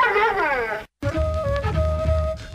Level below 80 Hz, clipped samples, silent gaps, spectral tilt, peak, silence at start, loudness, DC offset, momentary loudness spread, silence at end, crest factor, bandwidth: -28 dBFS; under 0.1%; none; -6.5 dB/octave; -8 dBFS; 0 s; -23 LUFS; under 0.1%; 8 LU; 0 s; 12 dB; 11 kHz